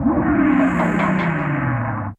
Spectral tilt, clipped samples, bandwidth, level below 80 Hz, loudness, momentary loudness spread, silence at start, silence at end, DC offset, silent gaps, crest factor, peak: -8.5 dB/octave; under 0.1%; 8.4 kHz; -38 dBFS; -18 LUFS; 5 LU; 0 s; 0.05 s; under 0.1%; none; 12 dB; -6 dBFS